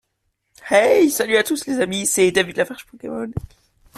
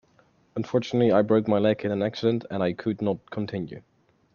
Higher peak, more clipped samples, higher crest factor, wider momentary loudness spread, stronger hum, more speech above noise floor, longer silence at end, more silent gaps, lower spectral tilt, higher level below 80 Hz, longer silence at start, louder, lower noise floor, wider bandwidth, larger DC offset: first, -2 dBFS vs -6 dBFS; neither; about the same, 18 dB vs 20 dB; first, 16 LU vs 13 LU; neither; first, 53 dB vs 37 dB; about the same, 0.6 s vs 0.55 s; neither; second, -3.5 dB/octave vs -8 dB/octave; first, -50 dBFS vs -66 dBFS; about the same, 0.65 s vs 0.55 s; first, -18 LUFS vs -25 LUFS; first, -72 dBFS vs -62 dBFS; first, 15 kHz vs 7 kHz; neither